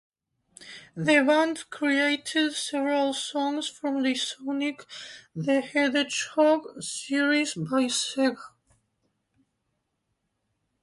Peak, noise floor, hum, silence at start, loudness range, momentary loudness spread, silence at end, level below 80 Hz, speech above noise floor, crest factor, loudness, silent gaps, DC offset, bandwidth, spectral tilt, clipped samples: -8 dBFS; -78 dBFS; none; 0.6 s; 4 LU; 12 LU; 2.35 s; -74 dBFS; 52 dB; 20 dB; -26 LUFS; none; under 0.1%; 11.5 kHz; -3.5 dB/octave; under 0.1%